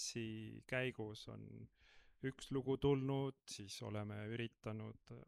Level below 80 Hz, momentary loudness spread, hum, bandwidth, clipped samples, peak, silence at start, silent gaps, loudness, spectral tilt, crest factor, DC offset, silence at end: -66 dBFS; 16 LU; none; 13.5 kHz; under 0.1%; -24 dBFS; 0 s; none; -44 LUFS; -5.5 dB/octave; 20 dB; under 0.1%; 0.05 s